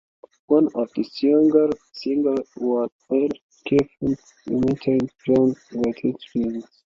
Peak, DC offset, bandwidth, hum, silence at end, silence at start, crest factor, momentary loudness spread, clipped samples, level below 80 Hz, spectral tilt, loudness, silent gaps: -4 dBFS; under 0.1%; 7.4 kHz; none; 0.3 s; 0.5 s; 18 dB; 9 LU; under 0.1%; -56 dBFS; -8 dB/octave; -22 LUFS; 2.92-2.99 s, 3.42-3.49 s